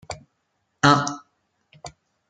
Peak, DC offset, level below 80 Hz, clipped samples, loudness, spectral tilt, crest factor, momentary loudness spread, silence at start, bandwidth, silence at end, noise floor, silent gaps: -2 dBFS; under 0.1%; -58 dBFS; under 0.1%; -20 LUFS; -4.5 dB/octave; 24 dB; 25 LU; 0.1 s; 9.4 kHz; 0.4 s; -73 dBFS; none